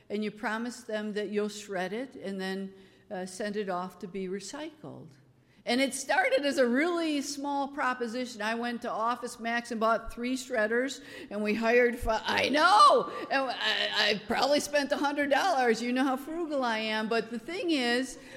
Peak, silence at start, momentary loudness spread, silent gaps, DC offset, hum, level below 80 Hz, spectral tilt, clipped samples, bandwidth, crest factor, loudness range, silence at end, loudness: -8 dBFS; 0.1 s; 12 LU; none; under 0.1%; none; -56 dBFS; -3.5 dB/octave; under 0.1%; 16 kHz; 20 dB; 10 LU; 0 s; -29 LUFS